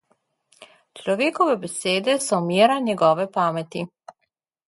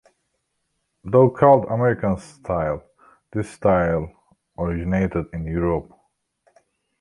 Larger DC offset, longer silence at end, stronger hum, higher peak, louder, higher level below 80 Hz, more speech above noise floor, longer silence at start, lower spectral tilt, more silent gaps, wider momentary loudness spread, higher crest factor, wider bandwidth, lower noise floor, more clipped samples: neither; second, 0.8 s vs 1.2 s; neither; about the same, -4 dBFS vs -2 dBFS; about the same, -21 LUFS vs -21 LUFS; second, -70 dBFS vs -42 dBFS; about the same, 55 dB vs 54 dB; second, 0.6 s vs 1.05 s; second, -4.5 dB/octave vs -9 dB/octave; neither; about the same, 13 LU vs 14 LU; about the same, 20 dB vs 20 dB; about the same, 11.5 kHz vs 11.5 kHz; about the same, -76 dBFS vs -74 dBFS; neither